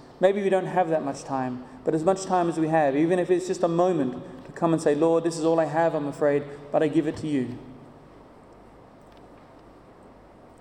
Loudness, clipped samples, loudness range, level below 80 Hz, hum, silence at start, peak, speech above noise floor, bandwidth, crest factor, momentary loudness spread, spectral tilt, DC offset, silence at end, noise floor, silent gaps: -24 LUFS; under 0.1%; 7 LU; -60 dBFS; none; 0.1 s; -8 dBFS; 26 dB; 11 kHz; 18 dB; 8 LU; -6.5 dB/octave; under 0.1%; 1.25 s; -50 dBFS; none